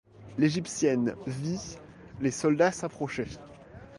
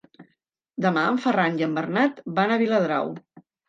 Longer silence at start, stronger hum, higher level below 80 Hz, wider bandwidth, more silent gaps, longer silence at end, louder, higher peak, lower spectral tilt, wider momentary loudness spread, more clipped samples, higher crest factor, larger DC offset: about the same, 0.2 s vs 0.2 s; neither; first, -58 dBFS vs -76 dBFS; first, 11.5 kHz vs 7.6 kHz; neither; second, 0 s vs 0.3 s; second, -29 LUFS vs -23 LUFS; about the same, -10 dBFS vs -8 dBFS; second, -5.5 dB/octave vs -7 dB/octave; first, 21 LU vs 7 LU; neither; about the same, 20 dB vs 16 dB; neither